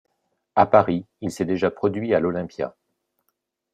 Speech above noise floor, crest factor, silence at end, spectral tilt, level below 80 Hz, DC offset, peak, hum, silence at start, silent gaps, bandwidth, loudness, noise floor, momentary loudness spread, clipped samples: 54 dB; 22 dB; 1.05 s; -7 dB/octave; -62 dBFS; under 0.1%; -2 dBFS; none; 0.55 s; none; 13.5 kHz; -22 LUFS; -76 dBFS; 14 LU; under 0.1%